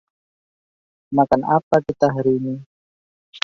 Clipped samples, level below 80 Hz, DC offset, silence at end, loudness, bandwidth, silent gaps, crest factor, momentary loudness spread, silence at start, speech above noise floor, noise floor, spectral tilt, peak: under 0.1%; -56 dBFS; under 0.1%; 0.05 s; -19 LUFS; 7.4 kHz; 1.63-1.71 s, 2.66-3.33 s; 20 dB; 8 LU; 1.1 s; over 72 dB; under -90 dBFS; -7.5 dB/octave; -2 dBFS